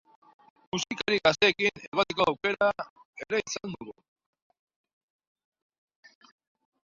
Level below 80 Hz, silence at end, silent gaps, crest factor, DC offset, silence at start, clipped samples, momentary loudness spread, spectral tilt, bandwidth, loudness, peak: -66 dBFS; 2.95 s; 1.88-1.92 s, 2.90-2.96 s, 3.05-3.13 s; 24 dB; under 0.1%; 0.75 s; under 0.1%; 18 LU; -3 dB/octave; 7.6 kHz; -27 LUFS; -6 dBFS